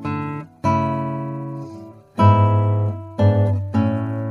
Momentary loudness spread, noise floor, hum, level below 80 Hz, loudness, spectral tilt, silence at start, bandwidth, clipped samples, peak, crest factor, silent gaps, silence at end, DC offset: 16 LU; -38 dBFS; none; -54 dBFS; -20 LUFS; -9.5 dB/octave; 0 s; 6.2 kHz; under 0.1%; -2 dBFS; 18 dB; none; 0 s; under 0.1%